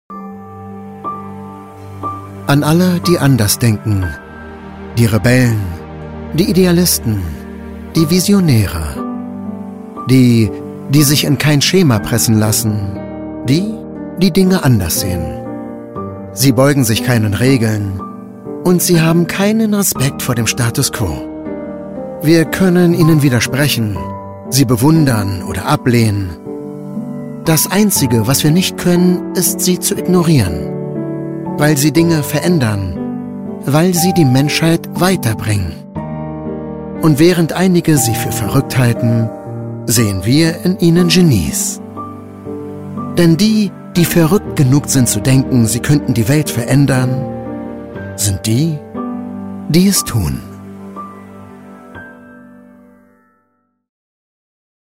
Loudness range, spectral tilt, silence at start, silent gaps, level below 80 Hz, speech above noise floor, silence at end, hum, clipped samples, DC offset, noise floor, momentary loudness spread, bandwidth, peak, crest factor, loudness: 3 LU; -5 dB/octave; 0.1 s; none; -38 dBFS; 51 dB; 2.5 s; none; under 0.1%; under 0.1%; -63 dBFS; 16 LU; 16.5 kHz; 0 dBFS; 14 dB; -13 LUFS